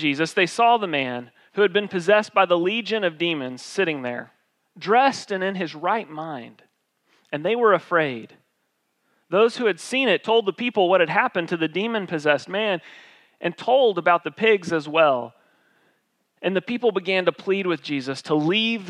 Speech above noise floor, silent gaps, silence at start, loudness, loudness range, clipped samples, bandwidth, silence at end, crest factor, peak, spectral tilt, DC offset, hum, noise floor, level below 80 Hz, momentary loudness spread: 51 dB; none; 0 s; -22 LUFS; 4 LU; under 0.1%; 11.5 kHz; 0 s; 18 dB; -4 dBFS; -5 dB/octave; under 0.1%; none; -72 dBFS; -82 dBFS; 11 LU